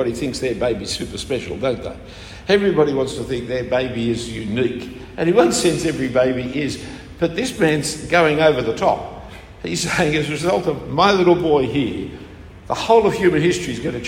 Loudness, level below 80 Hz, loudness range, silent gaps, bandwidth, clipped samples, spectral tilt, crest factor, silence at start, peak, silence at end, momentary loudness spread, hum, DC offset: -19 LUFS; -42 dBFS; 3 LU; none; 16 kHz; under 0.1%; -5 dB/octave; 18 dB; 0 s; 0 dBFS; 0 s; 16 LU; none; under 0.1%